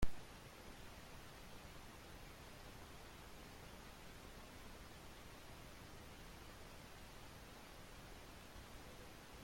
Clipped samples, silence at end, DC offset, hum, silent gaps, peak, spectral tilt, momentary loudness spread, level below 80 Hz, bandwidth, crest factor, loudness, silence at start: under 0.1%; 0 s; under 0.1%; none; none; -24 dBFS; -4 dB/octave; 1 LU; -58 dBFS; 16.5 kHz; 26 dB; -57 LUFS; 0 s